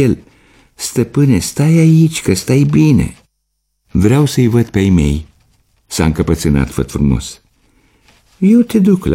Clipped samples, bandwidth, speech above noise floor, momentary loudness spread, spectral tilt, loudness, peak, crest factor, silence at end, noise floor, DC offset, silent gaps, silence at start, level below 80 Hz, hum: under 0.1%; 16 kHz; 57 dB; 10 LU; -6.5 dB/octave; -13 LUFS; 0 dBFS; 12 dB; 0 s; -68 dBFS; under 0.1%; none; 0 s; -28 dBFS; none